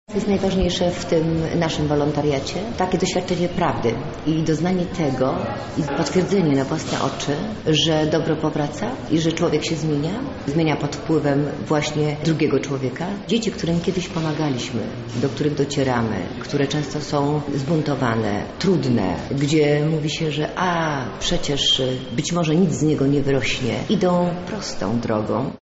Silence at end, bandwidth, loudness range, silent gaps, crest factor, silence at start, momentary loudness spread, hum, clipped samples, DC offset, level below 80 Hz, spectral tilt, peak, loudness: 0.05 s; 8 kHz; 3 LU; none; 12 dB; 0.1 s; 6 LU; none; under 0.1%; under 0.1%; -42 dBFS; -5 dB/octave; -8 dBFS; -21 LUFS